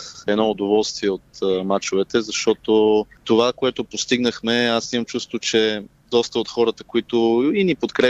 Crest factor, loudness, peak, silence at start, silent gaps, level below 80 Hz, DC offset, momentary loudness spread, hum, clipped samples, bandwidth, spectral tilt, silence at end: 16 dB; -20 LUFS; -4 dBFS; 0 s; none; -56 dBFS; under 0.1%; 7 LU; none; under 0.1%; 8.2 kHz; -4 dB/octave; 0 s